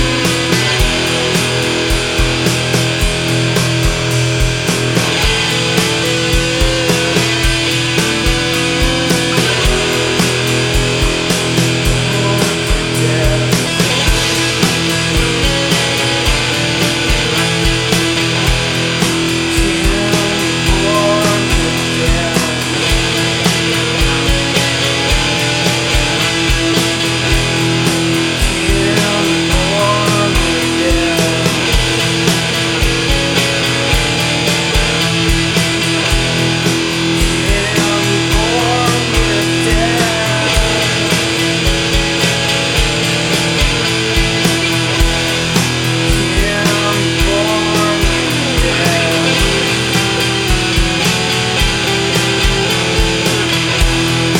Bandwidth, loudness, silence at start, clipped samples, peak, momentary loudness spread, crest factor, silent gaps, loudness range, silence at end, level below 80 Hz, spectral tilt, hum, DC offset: 19.5 kHz; -12 LUFS; 0 s; under 0.1%; 0 dBFS; 1 LU; 12 dB; none; 1 LU; 0 s; -22 dBFS; -3.5 dB/octave; none; under 0.1%